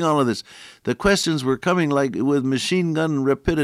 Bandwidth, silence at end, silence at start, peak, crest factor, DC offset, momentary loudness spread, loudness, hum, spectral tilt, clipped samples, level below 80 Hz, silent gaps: 15 kHz; 0 s; 0 s; -6 dBFS; 14 dB; under 0.1%; 8 LU; -21 LUFS; none; -5.5 dB/octave; under 0.1%; -44 dBFS; none